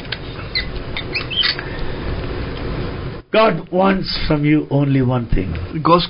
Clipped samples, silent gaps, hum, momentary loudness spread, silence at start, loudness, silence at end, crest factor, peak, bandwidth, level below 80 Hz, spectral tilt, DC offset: under 0.1%; none; none; 11 LU; 0 s; -19 LUFS; 0 s; 16 dB; -2 dBFS; 5.4 kHz; -30 dBFS; -10.5 dB/octave; under 0.1%